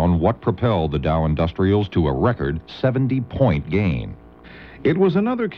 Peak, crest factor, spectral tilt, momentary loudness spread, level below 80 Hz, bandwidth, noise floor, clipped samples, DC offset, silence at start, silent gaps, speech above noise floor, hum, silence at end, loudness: -4 dBFS; 16 dB; -10 dB/octave; 6 LU; -36 dBFS; 6 kHz; -42 dBFS; under 0.1%; 0.1%; 0 s; none; 23 dB; none; 0 s; -20 LUFS